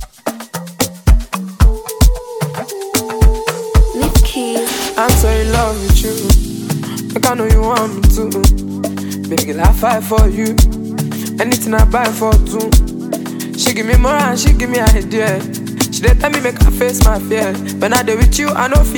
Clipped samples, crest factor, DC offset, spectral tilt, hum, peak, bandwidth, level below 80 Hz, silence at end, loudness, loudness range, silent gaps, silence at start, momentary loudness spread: under 0.1%; 12 dB; under 0.1%; -5 dB/octave; none; 0 dBFS; 19.5 kHz; -14 dBFS; 0 s; -14 LUFS; 2 LU; none; 0 s; 9 LU